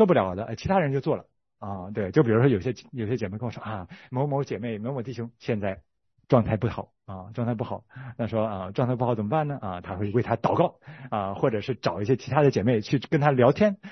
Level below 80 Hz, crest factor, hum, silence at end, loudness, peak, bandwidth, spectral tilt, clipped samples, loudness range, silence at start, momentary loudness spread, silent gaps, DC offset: -58 dBFS; 22 dB; none; 0 s; -26 LUFS; -4 dBFS; 6.4 kHz; -8 dB/octave; under 0.1%; 5 LU; 0 s; 14 LU; none; under 0.1%